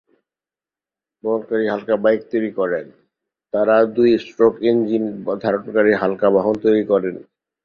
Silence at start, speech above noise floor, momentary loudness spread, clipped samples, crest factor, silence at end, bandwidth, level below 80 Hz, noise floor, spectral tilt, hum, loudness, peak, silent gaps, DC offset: 1.25 s; over 73 dB; 8 LU; under 0.1%; 16 dB; 0.4 s; 6.6 kHz; -60 dBFS; under -90 dBFS; -8 dB/octave; none; -18 LUFS; -2 dBFS; none; under 0.1%